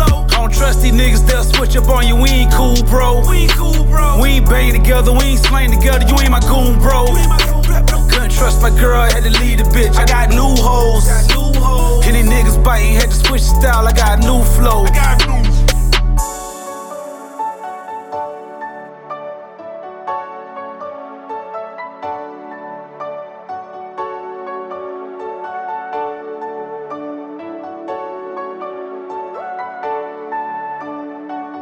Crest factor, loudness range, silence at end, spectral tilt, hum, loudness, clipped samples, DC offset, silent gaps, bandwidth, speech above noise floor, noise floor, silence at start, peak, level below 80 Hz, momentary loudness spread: 12 dB; 15 LU; 0 s; -4.5 dB/octave; none; -13 LUFS; under 0.1%; under 0.1%; none; 19 kHz; 22 dB; -31 dBFS; 0 s; 0 dBFS; -14 dBFS; 17 LU